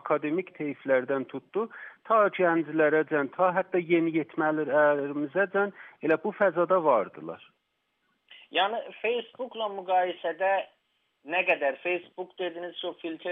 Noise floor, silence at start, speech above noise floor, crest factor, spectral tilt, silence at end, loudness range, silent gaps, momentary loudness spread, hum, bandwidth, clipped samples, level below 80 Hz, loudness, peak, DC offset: -77 dBFS; 0.05 s; 49 dB; 18 dB; -3 dB/octave; 0 s; 5 LU; none; 12 LU; none; 3.9 kHz; under 0.1%; -88 dBFS; -27 LUFS; -10 dBFS; under 0.1%